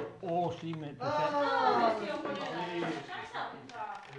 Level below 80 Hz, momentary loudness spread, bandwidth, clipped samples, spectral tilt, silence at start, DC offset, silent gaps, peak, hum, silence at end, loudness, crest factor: -74 dBFS; 13 LU; 11 kHz; under 0.1%; -5.5 dB/octave; 0 s; under 0.1%; none; -16 dBFS; none; 0 s; -34 LUFS; 18 dB